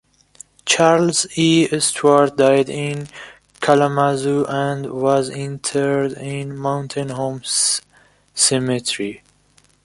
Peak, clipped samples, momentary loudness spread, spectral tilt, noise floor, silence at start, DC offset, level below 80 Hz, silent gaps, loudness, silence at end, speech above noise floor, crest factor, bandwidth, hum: -2 dBFS; under 0.1%; 11 LU; -4 dB/octave; -56 dBFS; 0.65 s; under 0.1%; -58 dBFS; none; -18 LUFS; 0.65 s; 38 dB; 18 dB; 11.5 kHz; 50 Hz at -50 dBFS